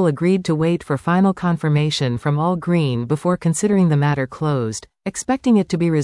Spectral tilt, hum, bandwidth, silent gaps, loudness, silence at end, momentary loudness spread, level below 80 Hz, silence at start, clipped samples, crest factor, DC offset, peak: -6.5 dB/octave; none; 12 kHz; none; -19 LUFS; 0 s; 5 LU; -52 dBFS; 0 s; under 0.1%; 12 dB; under 0.1%; -6 dBFS